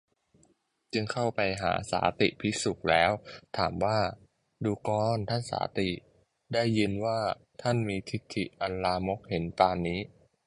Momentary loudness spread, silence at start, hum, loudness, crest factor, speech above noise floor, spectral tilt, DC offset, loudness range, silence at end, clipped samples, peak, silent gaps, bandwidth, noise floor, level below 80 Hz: 8 LU; 0.95 s; none; -30 LUFS; 22 dB; 39 dB; -5.5 dB/octave; under 0.1%; 3 LU; 0.4 s; under 0.1%; -8 dBFS; none; 11.5 kHz; -69 dBFS; -54 dBFS